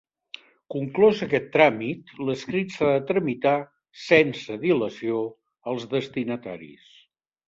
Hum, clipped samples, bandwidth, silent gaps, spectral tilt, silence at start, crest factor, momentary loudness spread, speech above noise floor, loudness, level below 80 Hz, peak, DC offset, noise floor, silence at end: none; under 0.1%; 7.6 kHz; none; -6.5 dB/octave; 0.7 s; 22 dB; 19 LU; 38 dB; -24 LUFS; -66 dBFS; -2 dBFS; under 0.1%; -62 dBFS; 0.8 s